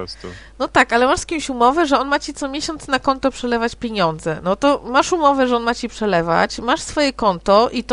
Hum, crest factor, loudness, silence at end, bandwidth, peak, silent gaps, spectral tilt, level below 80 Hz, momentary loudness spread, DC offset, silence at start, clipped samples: none; 18 dB; -18 LUFS; 0 s; 10.5 kHz; 0 dBFS; none; -4 dB/octave; -42 dBFS; 9 LU; under 0.1%; 0 s; under 0.1%